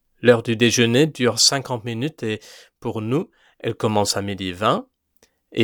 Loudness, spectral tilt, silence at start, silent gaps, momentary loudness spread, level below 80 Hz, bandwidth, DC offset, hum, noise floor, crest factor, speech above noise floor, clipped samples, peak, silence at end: -20 LUFS; -4 dB/octave; 0.2 s; none; 14 LU; -62 dBFS; 19.5 kHz; under 0.1%; none; -62 dBFS; 20 dB; 42 dB; under 0.1%; 0 dBFS; 0 s